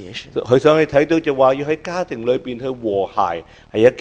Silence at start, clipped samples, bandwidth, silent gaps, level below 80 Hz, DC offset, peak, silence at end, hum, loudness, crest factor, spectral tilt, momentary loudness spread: 0 s; under 0.1%; 8.8 kHz; none; -50 dBFS; under 0.1%; 0 dBFS; 0 s; none; -18 LUFS; 18 dB; -6.5 dB/octave; 12 LU